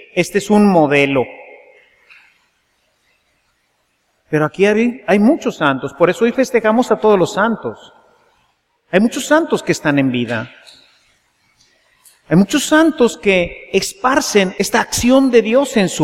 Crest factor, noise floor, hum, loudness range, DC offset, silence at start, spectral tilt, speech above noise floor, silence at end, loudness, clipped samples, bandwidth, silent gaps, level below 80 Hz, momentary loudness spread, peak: 16 dB; -64 dBFS; none; 6 LU; under 0.1%; 0.15 s; -5 dB/octave; 50 dB; 0 s; -14 LUFS; under 0.1%; 16.5 kHz; none; -48 dBFS; 7 LU; 0 dBFS